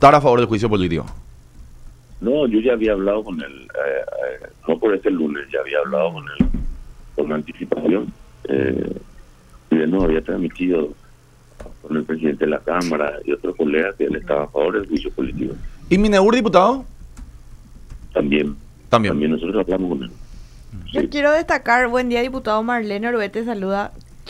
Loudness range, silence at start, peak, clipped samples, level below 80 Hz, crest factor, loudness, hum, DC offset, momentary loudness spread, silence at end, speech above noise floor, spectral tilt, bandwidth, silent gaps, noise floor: 4 LU; 0 s; 0 dBFS; under 0.1%; -36 dBFS; 20 dB; -20 LUFS; none; under 0.1%; 12 LU; 0 s; 29 dB; -6.5 dB/octave; 12.5 kHz; none; -48 dBFS